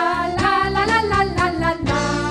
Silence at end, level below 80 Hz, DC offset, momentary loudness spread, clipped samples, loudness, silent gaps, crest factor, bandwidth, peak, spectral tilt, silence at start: 0 s; -34 dBFS; under 0.1%; 3 LU; under 0.1%; -19 LUFS; none; 14 dB; 14 kHz; -4 dBFS; -5 dB/octave; 0 s